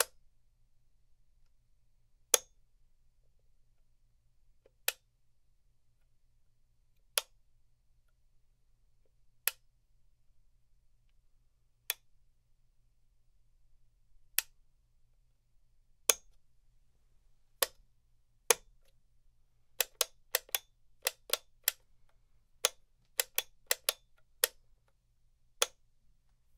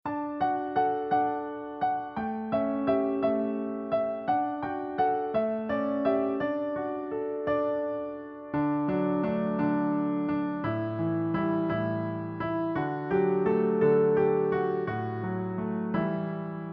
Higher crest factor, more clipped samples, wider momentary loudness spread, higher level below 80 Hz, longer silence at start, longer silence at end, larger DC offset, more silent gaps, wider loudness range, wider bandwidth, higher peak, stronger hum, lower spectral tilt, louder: first, 42 dB vs 16 dB; neither; about the same, 7 LU vs 8 LU; second, -70 dBFS vs -62 dBFS; about the same, 0 s vs 0.05 s; first, 0.9 s vs 0 s; neither; neither; first, 10 LU vs 3 LU; first, 16 kHz vs 5.4 kHz; first, 0 dBFS vs -12 dBFS; neither; second, 2.5 dB/octave vs -7 dB/octave; second, -34 LUFS vs -29 LUFS